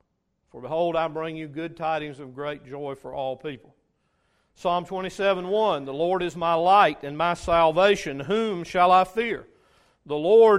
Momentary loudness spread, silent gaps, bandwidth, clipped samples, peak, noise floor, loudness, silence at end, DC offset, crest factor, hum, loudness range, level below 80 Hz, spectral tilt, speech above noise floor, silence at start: 16 LU; none; 11.5 kHz; under 0.1%; -6 dBFS; -73 dBFS; -24 LUFS; 0 s; under 0.1%; 18 dB; none; 11 LU; -54 dBFS; -5.5 dB/octave; 50 dB; 0.55 s